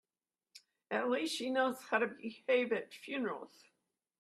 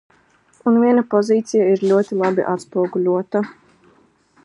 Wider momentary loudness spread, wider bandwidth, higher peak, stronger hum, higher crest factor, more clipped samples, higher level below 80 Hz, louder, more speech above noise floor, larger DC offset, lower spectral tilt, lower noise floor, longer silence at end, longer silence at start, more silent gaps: about the same, 10 LU vs 8 LU; first, 14 kHz vs 11 kHz; second, -16 dBFS vs -2 dBFS; neither; first, 22 dB vs 16 dB; neither; second, -86 dBFS vs -70 dBFS; second, -36 LUFS vs -18 LUFS; first, over 54 dB vs 39 dB; neither; second, -3.5 dB/octave vs -7 dB/octave; first, under -90 dBFS vs -56 dBFS; second, 0.75 s vs 0.9 s; about the same, 0.55 s vs 0.65 s; neither